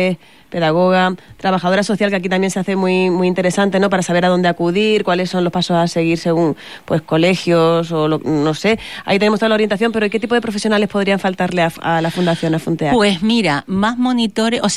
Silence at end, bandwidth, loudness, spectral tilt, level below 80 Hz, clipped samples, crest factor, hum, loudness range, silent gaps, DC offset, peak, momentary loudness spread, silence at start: 0 s; 13 kHz; -16 LUFS; -5.5 dB/octave; -50 dBFS; under 0.1%; 12 dB; none; 1 LU; none; 0.5%; -4 dBFS; 4 LU; 0 s